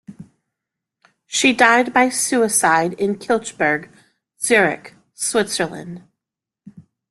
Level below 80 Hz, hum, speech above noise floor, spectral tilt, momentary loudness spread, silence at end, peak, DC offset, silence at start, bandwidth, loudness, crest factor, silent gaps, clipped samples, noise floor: -62 dBFS; none; 67 dB; -2.5 dB/octave; 12 LU; 0.3 s; -2 dBFS; under 0.1%; 0.1 s; 12.5 kHz; -17 LUFS; 18 dB; none; under 0.1%; -85 dBFS